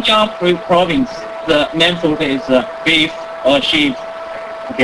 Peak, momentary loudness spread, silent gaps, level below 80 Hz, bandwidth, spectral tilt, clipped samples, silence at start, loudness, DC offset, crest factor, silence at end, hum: 0 dBFS; 13 LU; none; -44 dBFS; 11 kHz; -4.5 dB/octave; under 0.1%; 0 s; -14 LUFS; under 0.1%; 14 dB; 0 s; none